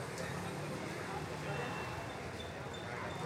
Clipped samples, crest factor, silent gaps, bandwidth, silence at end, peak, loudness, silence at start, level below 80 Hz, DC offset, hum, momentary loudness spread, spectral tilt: under 0.1%; 14 dB; none; 16 kHz; 0 s; -28 dBFS; -42 LUFS; 0 s; -60 dBFS; under 0.1%; none; 4 LU; -5 dB/octave